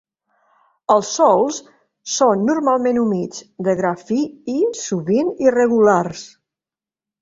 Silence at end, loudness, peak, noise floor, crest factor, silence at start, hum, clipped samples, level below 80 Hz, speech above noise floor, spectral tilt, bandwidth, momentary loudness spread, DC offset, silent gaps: 0.95 s; -18 LUFS; -2 dBFS; under -90 dBFS; 16 dB; 0.9 s; none; under 0.1%; -62 dBFS; over 73 dB; -5 dB/octave; 7.8 kHz; 12 LU; under 0.1%; none